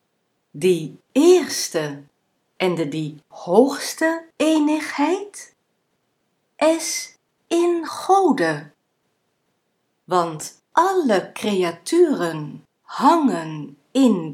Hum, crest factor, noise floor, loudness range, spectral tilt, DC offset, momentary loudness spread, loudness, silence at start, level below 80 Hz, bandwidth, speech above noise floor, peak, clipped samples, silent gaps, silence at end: none; 20 dB; -71 dBFS; 3 LU; -4.5 dB/octave; under 0.1%; 15 LU; -20 LUFS; 0.55 s; -76 dBFS; 16 kHz; 51 dB; 0 dBFS; under 0.1%; none; 0 s